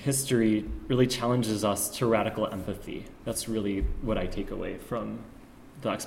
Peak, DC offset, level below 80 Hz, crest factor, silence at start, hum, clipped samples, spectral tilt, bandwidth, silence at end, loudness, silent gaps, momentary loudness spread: -10 dBFS; under 0.1%; -42 dBFS; 18 dB; 0 s; none; under 0.1%; -5 dB/octave; 16.5 kHz; 0 s; -29 LUFS; none; 12 LU